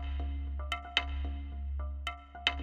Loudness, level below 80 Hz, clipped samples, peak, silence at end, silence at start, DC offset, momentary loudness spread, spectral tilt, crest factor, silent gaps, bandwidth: -37 LUFS; -38 dBFS; under 0.1%; -8 dBFS; 0 s; 0 s; under 0.1%; 8 LU; -4.5 dB/octave; 28 dB; none; 9.2 kHz